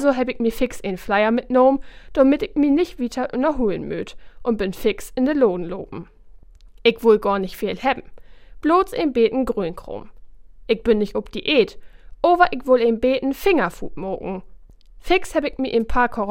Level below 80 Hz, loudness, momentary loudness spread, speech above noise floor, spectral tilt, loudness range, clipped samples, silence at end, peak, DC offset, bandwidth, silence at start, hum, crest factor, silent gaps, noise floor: -40 dBFS; -20 LUFS; 12 LU; 24 dB; -5.5 dB/octave; 3 LU; under 0.1%; 0 s; 0 dBFS; under 0.1%; 16.5 kHz; 0 s; none; 20 dB; none; -44 dBFS